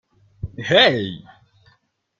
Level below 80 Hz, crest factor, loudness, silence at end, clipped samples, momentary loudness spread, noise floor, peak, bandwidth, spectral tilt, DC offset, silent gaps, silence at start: -50 dBFS; 22 dB; -16 LUFS; 1 s; under 0.1%; 22 LU; -64 dBFS; -2 dBFS; 7.6 kHz; -5 dB/octave; under 0.1%; none; 0.45 s